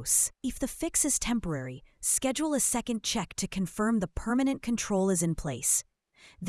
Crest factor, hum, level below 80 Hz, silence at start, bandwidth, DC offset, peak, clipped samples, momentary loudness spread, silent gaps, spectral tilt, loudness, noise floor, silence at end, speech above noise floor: 20 dB; none; -48 dBFS; 0 s; 12 kHz; under 0.1%; -10 dBFS; under 0.1%; 8 LU; none; -3.5 dB/octave; -28 LUFS; -59 dBFS; 0 s; 30 dB